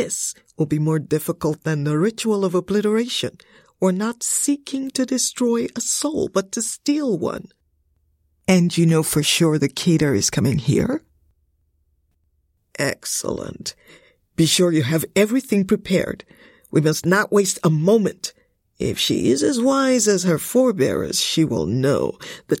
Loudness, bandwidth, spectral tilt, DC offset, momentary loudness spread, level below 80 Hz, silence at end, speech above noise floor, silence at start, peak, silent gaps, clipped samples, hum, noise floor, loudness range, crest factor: -20 LUFS; 16.5 kHz; -4.5 dB/octave; under 0.1%; 10 LU; -54 dBFS; 0 s; 47 dB; 0 s; -4 dBFS; none; under 0.1%; none; -67 dBFS; 5 LU; 18 dB